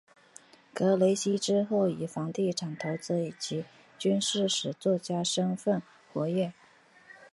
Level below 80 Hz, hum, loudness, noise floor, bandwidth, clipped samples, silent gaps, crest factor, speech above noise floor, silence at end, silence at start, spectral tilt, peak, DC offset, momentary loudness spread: -74 dBFS; none; -30 LUFS; -59 dBFS; 11.5 kHz; under 0.1%; none; 18 dB; 30 dB; 0.05 s; 0.75 s; -5 dB/octave; -12 dBFS; under 0.1%; 9 LU